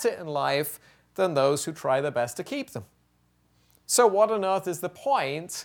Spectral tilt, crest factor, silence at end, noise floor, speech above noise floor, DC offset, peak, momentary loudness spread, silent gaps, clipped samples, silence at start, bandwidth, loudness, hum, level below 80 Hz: -3.5 dB/octave; 20 dB; 0 s; -67 dBFS; 41 dB; under 0.1%; -8 dBFS; 13 LU; none; under 0.1%; 0 s; 19.5 kHz; -26 LUFS; 60 Hz at -65 dBFS; -70 dBFS